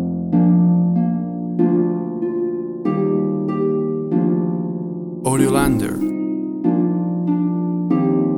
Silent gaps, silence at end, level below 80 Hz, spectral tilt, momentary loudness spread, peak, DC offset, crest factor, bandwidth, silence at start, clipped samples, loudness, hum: none; 0 s; -44 dBFS; -8 dB/octave; 8 LU; -2 dBFS; under 0.1%; 16 dB; 13.5 kHz; 0 s; under 0.1%; -19 LUFS; none